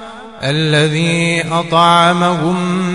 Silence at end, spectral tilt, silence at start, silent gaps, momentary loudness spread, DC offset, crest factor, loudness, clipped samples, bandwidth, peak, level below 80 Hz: 0 s; -5 dB/octave; 0 s; none; 8 LU; 0.5%; 14 dB; -13 LUFS; under 0.1%; 11 kHz; 0 dBFS; -50 dBFS